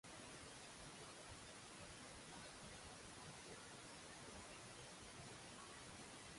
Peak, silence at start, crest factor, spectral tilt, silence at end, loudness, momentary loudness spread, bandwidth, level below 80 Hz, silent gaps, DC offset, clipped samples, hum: -44 dBFS; 0.05 s; 14 dB; -2.5 dB/octave; 0 s; -56 LUFS; 1 LU; 11.5 kHz; -72 dBFS; none; under 0.1%; under 0.1%; none